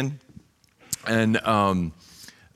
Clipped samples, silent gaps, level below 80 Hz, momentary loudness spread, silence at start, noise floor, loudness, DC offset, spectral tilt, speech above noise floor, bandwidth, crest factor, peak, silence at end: under 0.1%; none; -54 dBFS; 24 LU; 0 s; -57 dBFS; -24 LUFS; under 0.1%; -5 dB/octave; 35 dB; 15 kHz; 20 dB; -6 dBFS; 0.25 s